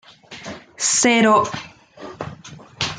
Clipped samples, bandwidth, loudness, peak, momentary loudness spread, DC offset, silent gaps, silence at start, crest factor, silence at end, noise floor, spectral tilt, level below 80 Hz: under 0.1%; 9.8 kHz; -16 LUFS; -4 dBFS; 25 LU; under 0.1%; none; 0.3 s; 18 dB; 0 s; -40 dBFS; -2.5 dB/octave; -58 dBFS